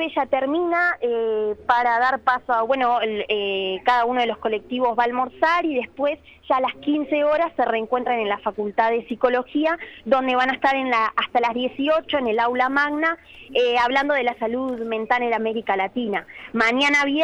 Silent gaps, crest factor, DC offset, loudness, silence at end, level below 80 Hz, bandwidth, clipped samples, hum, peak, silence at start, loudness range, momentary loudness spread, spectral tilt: none; 16 dB; under 0.1%; -21 LUFS; 0 s; -58 dBFS; 10.5 kHz; under 0.1%; none; -4 dBFS; 0 s; 1 LU; 6 LU; -4 dB/octave